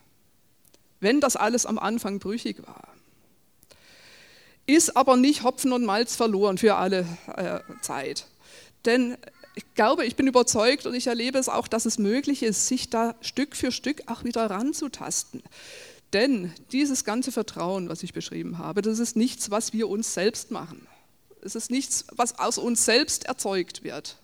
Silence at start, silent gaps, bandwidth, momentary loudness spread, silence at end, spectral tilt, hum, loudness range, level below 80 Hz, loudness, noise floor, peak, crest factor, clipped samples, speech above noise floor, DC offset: 1 s; none; over 20 kHz; 14 LU; 0.1 s; -3 dB/octave; none; 5 LU; -64 dBFS; -25 LUFS; -65 dBFS; -4 dBFS; 22 dB; under 0.1%; 40 dB; under 0.1%